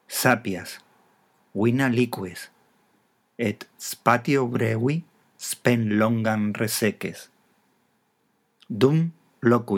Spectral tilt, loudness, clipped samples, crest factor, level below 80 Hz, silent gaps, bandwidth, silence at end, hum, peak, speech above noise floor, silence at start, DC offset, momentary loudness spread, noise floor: -5.5 dB/octave; -24 LUFS; under 0.1%; 22 dB; -74 dBFS; none; 19 kHz; 0 s; none; -2 dBFS; 46 dB; 0.1 s; under 0.1%; 15 LU; -69 dBFS